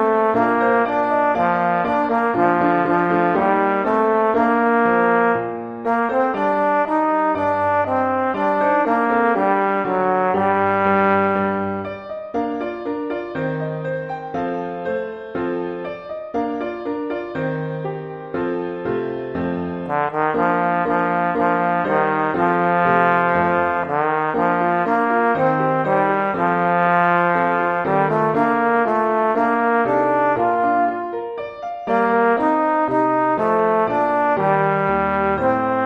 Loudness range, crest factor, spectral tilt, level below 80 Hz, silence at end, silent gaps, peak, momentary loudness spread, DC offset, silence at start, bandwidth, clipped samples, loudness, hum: 8 LU; 16 dB; -8.5 dB/octave; -54 dBFS; 0 s; none; -2 dBFS; 9 LU; under 0.1%; 0 s; 7.6 kHz; under 0.1%; -19 LUFS; none